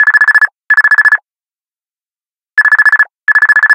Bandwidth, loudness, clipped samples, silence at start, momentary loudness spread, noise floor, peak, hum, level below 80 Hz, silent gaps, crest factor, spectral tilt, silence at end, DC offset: 16.5 kHz; -7 LUFS; 0.6%; 0 s; 5 LU; under -90 dBFS; 0 dBFS; none; -72 dBFS; none; 10 dB; 2.5 dB/octave; 0 s; under 0.1%